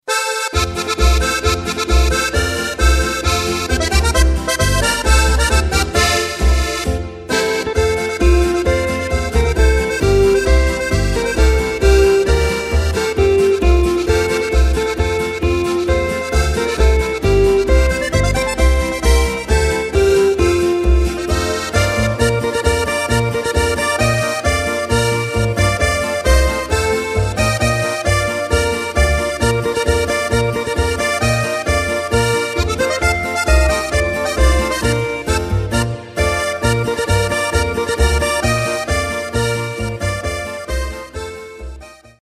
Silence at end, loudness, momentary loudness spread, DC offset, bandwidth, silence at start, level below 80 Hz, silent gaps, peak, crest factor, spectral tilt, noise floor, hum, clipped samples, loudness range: 0.3 s; -16 LUFS; 5 LU; under 0.1%; 15 kHz; 0.05 s; -20 dBFS; none; 0 dBFS; 14 dB; -4.5 dB/octave; -36 dBFS; none; under 0.1%; 3 LU